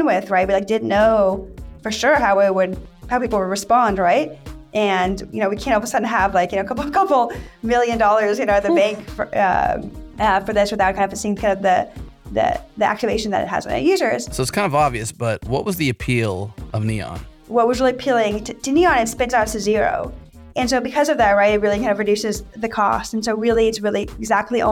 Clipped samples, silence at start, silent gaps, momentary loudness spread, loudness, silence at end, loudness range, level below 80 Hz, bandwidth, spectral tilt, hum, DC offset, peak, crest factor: under 0.1%; 0 s; none; 10 LU; -19 LUFS; 0 s; 2 LU; -40 dBFS; 17.5 kHz; -5 dB/octave; none; under 0.1%; -4 dBFS; 14 dB